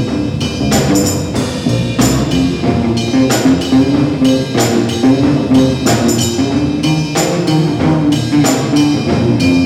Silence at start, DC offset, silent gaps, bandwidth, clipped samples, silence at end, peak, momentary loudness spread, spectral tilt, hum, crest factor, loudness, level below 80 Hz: 0 s; under 0.1%; none; 16 kHz; under 0.1%; 0 s; -2 dBFS; 4 LU; -5.5 dB/octave; none; 10 dB; -12 LUFS; -34 dBFS